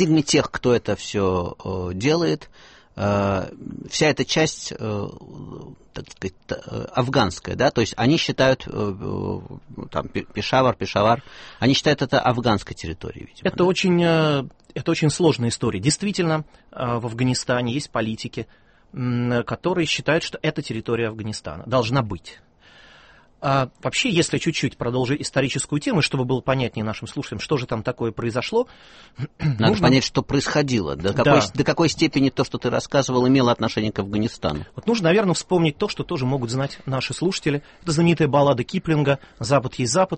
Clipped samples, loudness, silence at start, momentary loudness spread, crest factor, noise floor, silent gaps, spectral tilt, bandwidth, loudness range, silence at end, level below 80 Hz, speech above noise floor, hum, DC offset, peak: under 0.1%; -22 LUFS; 0 s; 12 LU; 20 dB; -51 dBFS; none; -5 dB/octave; 8.8 kHz; 5 LU; 0 s; -48 dBFS; 29 dB; none; under 0.1%; -2 dBFS